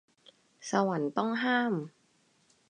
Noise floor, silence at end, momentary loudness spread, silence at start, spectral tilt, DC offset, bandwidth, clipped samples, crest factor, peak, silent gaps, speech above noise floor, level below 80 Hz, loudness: -69 dBFS; 0.8 s; 13 LU; 0.6 s; -5 dB/octave; under 0.1%; 10.5 kHz; under 0.1%; 20 dB; -12 dBFS; none; 39 dB; -84 dBFS; -30 LUFS